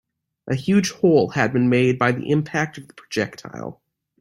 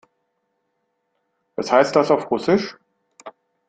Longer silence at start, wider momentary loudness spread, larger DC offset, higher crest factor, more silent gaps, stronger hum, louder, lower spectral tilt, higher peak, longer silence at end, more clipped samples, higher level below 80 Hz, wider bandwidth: second, 0.45 s vs 1.6 s; about the same, 16 LU vs 15 LU; neither; about the same, 18 dB vs 22 dB; neither; neither; about the same, -20 LUFS vs -19 LUFS; about the same, -6 dB/octave vs -5.5 dB/octave; about the same, -2 dBFS vs -2 dBFS; about the same, 0.45 s vs 0.4 s; neither; first, -58 dBFS vs -64 dBFS; first, 13 kHz vs 9.2 kHz